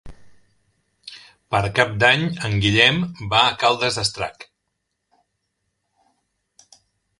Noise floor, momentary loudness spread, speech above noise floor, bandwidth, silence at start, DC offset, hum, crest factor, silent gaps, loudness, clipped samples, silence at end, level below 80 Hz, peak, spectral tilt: -76 dBFS; 15 LU; 57 dB; 11.5 kHz; 0.05 s; under 0.1%; none; 22 dB; none; -18 LUFS; under 0.1%; 2.75 s; -48 dBFS; 0 dBFS; -4 dB/octave